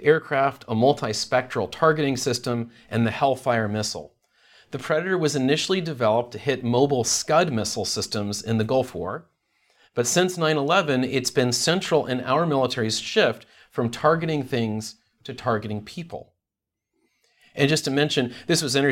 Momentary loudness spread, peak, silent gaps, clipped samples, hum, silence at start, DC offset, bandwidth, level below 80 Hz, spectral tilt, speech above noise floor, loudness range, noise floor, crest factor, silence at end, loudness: 12 LU; -4 dBFS; none; under 0.1%; none; 0 s; under 0.1%; 17 kHz; -62 dBFS; -4 dB/octave; 63 dB; 5 LU; -86 dBFS; 20 dB; 0 s; -23 LUFS